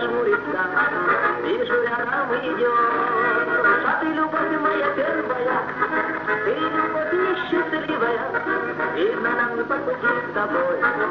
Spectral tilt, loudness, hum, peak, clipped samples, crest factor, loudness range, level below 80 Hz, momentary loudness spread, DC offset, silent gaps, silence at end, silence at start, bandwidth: -2.5 dB/octave; -21 LUFS; none; -6 dBFS; under 0.1%; 14 dB; 2 LU; -60 dBFS; 4 LU; under 0.1%; none; 0 s; 0 s; 6.2 kHz